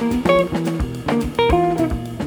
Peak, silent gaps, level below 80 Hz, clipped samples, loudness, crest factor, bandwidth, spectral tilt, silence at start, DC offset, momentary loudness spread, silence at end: -2 dBFS; none; -30 dBFS; under 0.1%; -19 LUFS; 16 dB; over 20 kHz; -6.5 dB/octave; 0 s; under 0.1%; 6 LU; 0 s